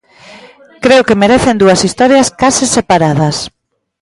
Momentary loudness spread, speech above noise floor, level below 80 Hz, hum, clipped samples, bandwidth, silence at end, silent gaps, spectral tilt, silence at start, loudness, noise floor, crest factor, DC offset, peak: 7 LU; 29 dB; -38 dBFS; none; under 0.1%; 11.5 kHz; 0.55 s; none; -4.5 dB/octave; 0.3 s; -9 LUFS; -37 dBFS; 10 dB; under 0.1%; 0 dBFS